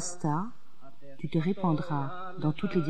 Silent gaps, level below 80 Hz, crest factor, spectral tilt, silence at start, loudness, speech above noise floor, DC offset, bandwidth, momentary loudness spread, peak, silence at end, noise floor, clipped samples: none; -60 dBFS; 16 dB; -6.5 dB/octave; 0 s; -32 LUFS; 26 dB; 2%; 9.6 kHz; 9 LU; -14 dBFS; 0 s; -56 dBFS; under 0.1%